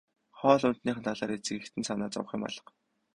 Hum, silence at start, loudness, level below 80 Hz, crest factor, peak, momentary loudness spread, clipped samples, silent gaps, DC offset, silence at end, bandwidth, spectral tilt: none; 0.35 s; -31 LUFS; -68 dBFS; 24 dB; -8 dBFS; 11 LU; under 0.1%; none; under 0.1%; 0.55 s; 11 kHz; -5 dB/octave